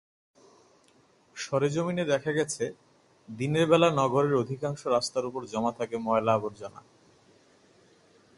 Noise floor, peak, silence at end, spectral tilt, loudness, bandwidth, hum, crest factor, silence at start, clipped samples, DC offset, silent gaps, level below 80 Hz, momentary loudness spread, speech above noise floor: -63 dBFS; -8 dBFS; 1.6 s; -5.5 dB/octave; -28 LUFS; 11.5 kHz; none; 22 dB; 1.35 s; under 0.1%; under 0.1%; none; -68 dBFS; 14 LU; 35 dB